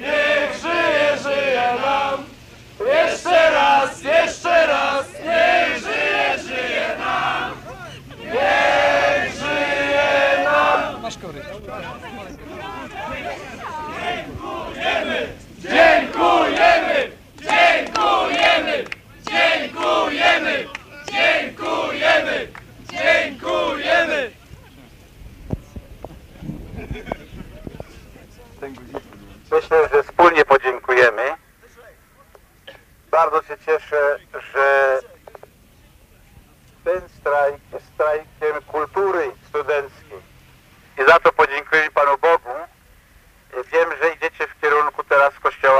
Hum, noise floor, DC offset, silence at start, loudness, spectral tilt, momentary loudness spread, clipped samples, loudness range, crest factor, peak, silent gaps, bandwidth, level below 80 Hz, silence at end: none; -51 dBFS; under 0.1%; 0 s; -18 LUFS; -3.5 dB/octave; 19 LU; under 0.1%; 10 LU; 20 dB; 0 dBFS; none; 15.5 kHz; -48 dBFS; 0 s